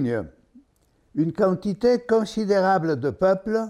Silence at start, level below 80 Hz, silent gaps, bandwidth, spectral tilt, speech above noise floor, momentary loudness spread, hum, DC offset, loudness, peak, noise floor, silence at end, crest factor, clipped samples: 0 s; -56 dBFS; none; 12 kHz; -7 dB/octave; 42 dB; 8 LU; none; under 0.1%; -22 LUFS; -8 dBFS; -63 dBFS; 0 s; 14 dB; under 0.1%